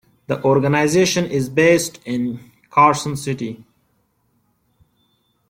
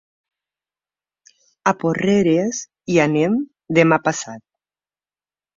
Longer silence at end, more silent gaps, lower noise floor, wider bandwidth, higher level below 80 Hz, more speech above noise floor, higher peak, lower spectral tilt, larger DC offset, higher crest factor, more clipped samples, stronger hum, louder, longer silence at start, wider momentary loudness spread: first, 1.95 s vs 1.15 s; neither; second, -65 dBFS vs under -90 dBFS; first, 16.5 kHz vs 7.8 kHz; about the same, -56 dBFS vs -60 dBFS; second, 47 dB vs over 73 dB; about the same, -2 dBFS vs 0 dBFS; about the same, -5 dB/octave vs -5.5 dB/octave; neither; about the same, 18 dB vs 20 dB; neither; second, none vs 50 Hz at -40 dBFS; about the same, -18 LUFS vs -18 LUFS; second, 0.3 s vs 1.65 s; about the same, 12 LU vs 10 LU